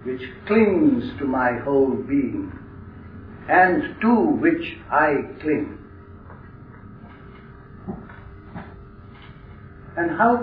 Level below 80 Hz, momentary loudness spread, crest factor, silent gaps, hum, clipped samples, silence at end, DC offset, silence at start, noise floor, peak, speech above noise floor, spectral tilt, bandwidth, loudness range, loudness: -48 dBFS; 25 LU; 18 dB; none; none; under 0.1%; 0 s; under 0.1%; 0 s; -42 dBFS; -4 dBFS; 23 dB; -10.5 dB/octave; 5.2 kHz; 20 LU; -21 LUFS